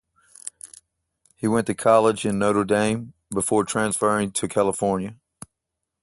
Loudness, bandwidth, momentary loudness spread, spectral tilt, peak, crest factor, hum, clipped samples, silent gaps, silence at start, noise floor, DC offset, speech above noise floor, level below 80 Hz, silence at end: -22 LUFS; 12 kHz; 18 LU; -4.5 dB/octave; -4 dBFS; 20 dB; none; under 0.1%; none; 0.45 s; -82 dBFS; under 0.1%; 61 dB; -56 dBFS; 0.9 s